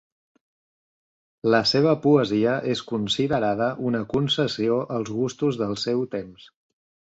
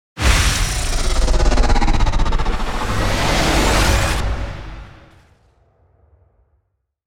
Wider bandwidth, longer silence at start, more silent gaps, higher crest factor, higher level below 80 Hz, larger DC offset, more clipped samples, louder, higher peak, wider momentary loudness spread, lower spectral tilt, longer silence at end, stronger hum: second, 8 kHz vs 16.5 kHz; first, 1.45 s vs 0.15 s; neither; about the same, 18 dB vs 16 dB; second, -58 dBFS vs -20 dBFS; neither; neither; second, -23 LUFS vs -18 LUFS; second, -6 dBFS vs -2 dBFS; about the same, 8 LU vs 10 LU; first, -6 dB/octave vs -4 dB/octave; first, 0.7 s vs 0 s; neither